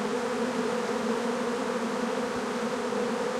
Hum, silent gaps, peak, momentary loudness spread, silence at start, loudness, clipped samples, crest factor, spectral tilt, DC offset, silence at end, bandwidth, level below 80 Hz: none; none; -16 dBFS; 1 LU; 0 s; -30 LUFS; under 0.1%; 12 dB; -4.5 dB/octave; under 0.1%; 0 s; 15 kHz; -68 dBFS